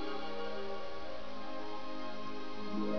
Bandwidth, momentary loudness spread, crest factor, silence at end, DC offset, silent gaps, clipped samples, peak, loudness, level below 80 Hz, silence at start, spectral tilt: 5.4 kHz; 4 LU; 16 dB; 0 s; 2%; none; under 0.1%; -24 dBFS; -43 LUFS; -64 dBFS; 0 s; -3.5 dB/octave